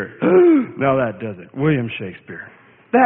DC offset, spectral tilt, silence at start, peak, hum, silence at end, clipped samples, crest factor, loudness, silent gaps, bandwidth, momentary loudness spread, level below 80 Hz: under 0.1%; -12.5 dB/octave; 0 s; -2 dBFS; none; 0 s; under 0.1%; 16 dB; -17 LUFS; none; 3.7 kHz; 21 LU; -56 dBFS